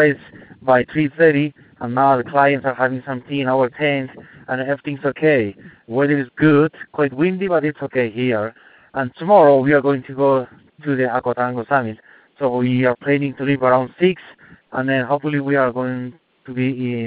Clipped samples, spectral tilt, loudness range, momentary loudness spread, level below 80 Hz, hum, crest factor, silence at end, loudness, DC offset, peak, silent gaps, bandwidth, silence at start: under 0.1%; -11.5 dB/octave; 3 LU; 12 LU; -60 dBFS; none; 18 dB; 0 s; -18 LUFS; under 0.1%; 0 dBFS; none; 4.7 kHz; 0 s